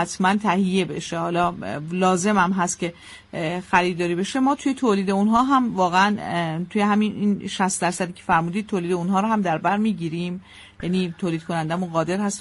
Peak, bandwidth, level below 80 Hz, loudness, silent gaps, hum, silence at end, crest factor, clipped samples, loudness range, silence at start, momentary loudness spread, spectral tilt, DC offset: -4 dBFS; 11.5 kHz; -56 dBFS; -22 LUFS; none; none; 0 s; 18 dB; under 0.1%; 4 LU; 0 s; 8 LU; -5 dB/octave; under 0.1%